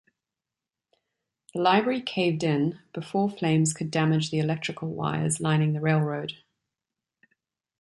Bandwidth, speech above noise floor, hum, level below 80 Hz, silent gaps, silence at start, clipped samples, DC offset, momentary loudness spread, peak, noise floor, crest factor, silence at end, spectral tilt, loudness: 11.5 kHz; 64 dB; none; -66 dBFS; none; 1.55 s; under 0.1%; under 0.1%; 8 LU; -8 dBFS; -89 dBFS; 20 dB; 1.45 s; -5.5 dB/octave; -26 LUFS